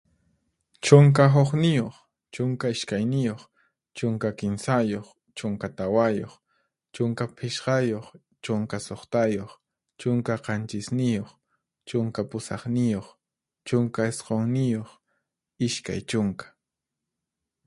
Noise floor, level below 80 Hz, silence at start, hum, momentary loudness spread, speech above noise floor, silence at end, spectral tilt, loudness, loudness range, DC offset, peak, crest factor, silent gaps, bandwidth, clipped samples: -86 dBFS; -60 dBFS; 0.85 s; none; 14 LU; 62 dB; 1.25 s; -6.5 dB/octave; -25 LUFS; 8 LU; under 0.1%; 0 dBFS; 26 dB; none; 11.5 kHz; under 0.1%